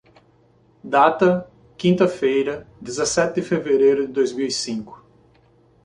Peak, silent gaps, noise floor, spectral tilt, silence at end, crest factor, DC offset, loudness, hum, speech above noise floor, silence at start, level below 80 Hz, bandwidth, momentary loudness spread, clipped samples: -2 dBFS; none; -56 dBFS; -5 dB/octave; 0.9 s; 20 dB; under 0.1%; -20 LUFS; none; 37 dB; 0.85 s; -58 dBFS; 11 kHz; 11 LU; under 0.1%